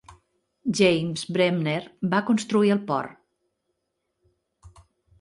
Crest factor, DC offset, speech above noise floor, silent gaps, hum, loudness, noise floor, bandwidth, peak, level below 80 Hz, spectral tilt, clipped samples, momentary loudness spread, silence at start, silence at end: 18 dB; under 0.1%; 55 dB; none; none; -24 LUFS; -78 dBFS; 11.5 kHz; -8 dBFS; -62 dBFS; -5.5 dB/octave; under 0.1%; 8 LU; 0.1 s; 0.5 s